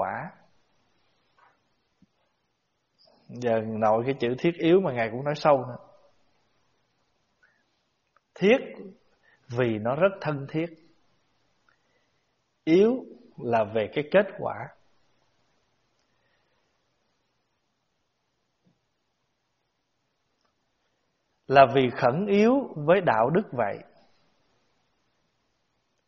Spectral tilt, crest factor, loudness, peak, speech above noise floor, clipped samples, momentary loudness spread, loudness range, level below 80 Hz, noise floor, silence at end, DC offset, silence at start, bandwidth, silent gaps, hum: -5 dB/octave; 26 dB; -24 LUFS; -2 dBFS; 53 dB; under 0.1%; 16 LU; 8 LU; -68 dBFS; -77 dBFS; 2.25 s; under 0.1%; 0 s; 7 kHz; none; none